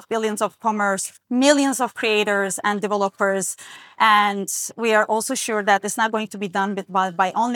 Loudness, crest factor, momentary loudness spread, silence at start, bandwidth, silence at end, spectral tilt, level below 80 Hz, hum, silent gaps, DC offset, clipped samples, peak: -20 LUFS; 18 dB; 8 LU; 0.1 s; 19.5 kHz; 0 s; -3 dB/octave; -78 dBFS; none; none; under 0.1%; under 0.1%; -4 dBFS